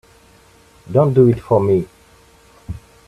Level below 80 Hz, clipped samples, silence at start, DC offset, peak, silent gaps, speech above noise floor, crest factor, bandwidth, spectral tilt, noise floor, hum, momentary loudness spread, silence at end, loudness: -46 dBFS; under 0.1%; 0.9 s; under 0.1%; 0 dBFS; none; 35 dB; 18 dB; 11.5 kHz; -10 dB/octave; -49 dBFS; none; 21 LU; 0.3 s; -15 LUFS